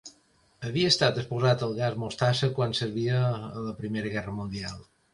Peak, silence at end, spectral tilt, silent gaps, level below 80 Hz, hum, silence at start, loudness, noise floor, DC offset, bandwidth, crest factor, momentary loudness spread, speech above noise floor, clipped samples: -8 dBFS; 0.3 s; -5.5 dB/octave; none; -56 dBFS; none; 0.05 s; -28 LUFS; -64 dBFS; under 0.1%; 11.5 kHz; 20 dB; 12 LU; 37 dB; under 0.1%